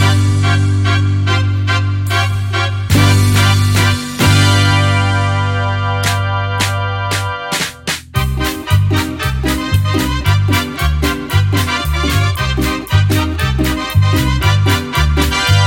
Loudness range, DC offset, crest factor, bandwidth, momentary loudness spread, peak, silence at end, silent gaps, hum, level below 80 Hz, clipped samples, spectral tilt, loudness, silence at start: 5 LU; under 0.1%; 12 dB; 17 kHz; 6 LU; 0 dBFS; 0 s; none; none; -24 dBFS; under 0.1%; -5 dB/octave; -14 LUFS; 0 s